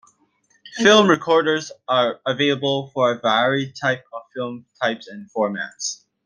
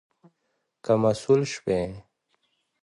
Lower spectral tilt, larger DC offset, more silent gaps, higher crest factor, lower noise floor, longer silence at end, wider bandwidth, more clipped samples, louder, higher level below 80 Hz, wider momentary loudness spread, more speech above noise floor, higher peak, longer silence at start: second, -4 dB/octave vs -6 dB/octave; neither; neither; about the same, 20 dB vs 20 dB; second, -63 dBFS vs -76 dBFS; second, 0.3 s vs 0.85 s; about the same, 10 kHz vs 11 kHz; neither; first, -20 LUFS vs -25 LUFS; second, -66 dBFS vs -56 dBFS; about the same, 16 LU vs 15 LU; second, 43 dB vs 53 dB; first, -2 dBFS vs -8 dBFS; second, 0.65 s vs 0.85 s